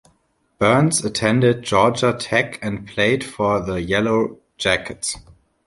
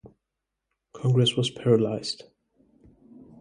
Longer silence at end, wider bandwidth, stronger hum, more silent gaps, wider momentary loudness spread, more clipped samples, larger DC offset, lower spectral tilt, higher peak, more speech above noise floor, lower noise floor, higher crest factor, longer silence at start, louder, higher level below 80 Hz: second, 0.5 s vs 1.25 s; about the same, 11.5 kHz vs 10.5 kHz; neither; neither; about the same, 10 LU vs 11 LU; neither; neither; second, -4.5 dB/octave vs -6 dB/octave; first, -2 dBFS vs -8 dBFS; second, 45 dB vs 61 dB; second, -64 dBFS vs -84 dBFS; about the same, 18 dB vs 18 dB; first, 0.6 s vs 0.05 s; first, -19 LUFS vs -24 LUFS; first, -46 dBFS vs -64 dBFS